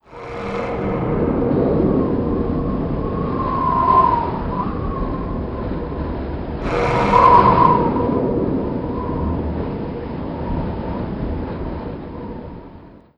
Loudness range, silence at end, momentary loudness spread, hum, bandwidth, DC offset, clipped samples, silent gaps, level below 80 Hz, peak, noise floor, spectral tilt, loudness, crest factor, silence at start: 9 LU; 0.2 s; 14 LU; none; 8 kHz; 0.2%; under 0.1%; none; -30 dBFS; 0 dBFS; -41 dBFS; -9 dB/octave; -19 LUFS; 20 dB; 0.1 s